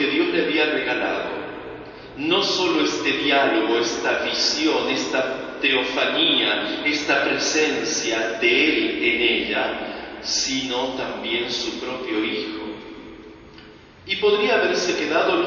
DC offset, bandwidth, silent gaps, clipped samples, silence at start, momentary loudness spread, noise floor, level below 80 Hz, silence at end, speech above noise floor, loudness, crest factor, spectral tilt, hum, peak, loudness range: under 0.1%; 7.2 kHz; none; under 0.1%; 0 s; 12 LU; -45 dBFS; -56 dBFS; 0 s; 24 dB; -20 LUFS; 16 dB; -2 dB/octave; none; -6 dBFS; 6 LU